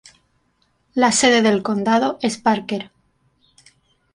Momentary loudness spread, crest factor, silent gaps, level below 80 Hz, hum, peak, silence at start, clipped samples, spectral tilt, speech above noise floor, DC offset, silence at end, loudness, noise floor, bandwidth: 14 LU; 18 dB; none; -60 dBFS; 50 Hz at -60 dBFS; -2 dBFS; 0.95 s; under 0.1%; -3.5 dB/octave; 47 dB; under 0.1%; 1.3 s; -18 LUFS; -65 dBFS; 11.5 kHz